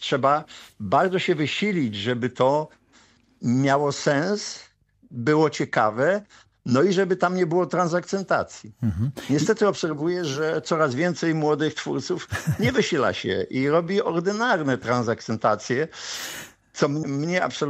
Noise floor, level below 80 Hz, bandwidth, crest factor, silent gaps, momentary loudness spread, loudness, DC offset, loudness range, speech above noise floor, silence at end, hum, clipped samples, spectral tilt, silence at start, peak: -57 dBFS; -56 dBFS; 15 kHz; 18 dB; none; 8 LU; -23 LUFS; under 0.1%; 2 LU; 34 dB; 0 s; none; under 0.1%; -5.5 dB/octave; 0 s; -6 dBFS